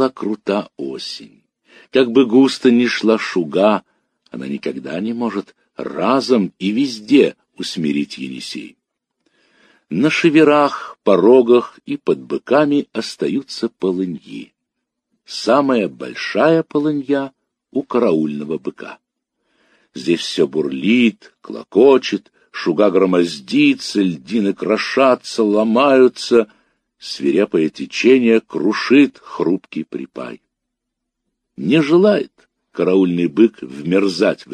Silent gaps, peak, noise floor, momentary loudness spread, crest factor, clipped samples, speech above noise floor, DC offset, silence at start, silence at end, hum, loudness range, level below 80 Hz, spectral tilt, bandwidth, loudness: none; 0 dBFS; -78 dBFS; 16 LU; 16 dB; under 0.1%; 62 dB; under 0.1%; 0 s; 0 s; none; 6 LU; -66 dBFS; -5.5 dB/octave; 10 kHz; -16 LUFS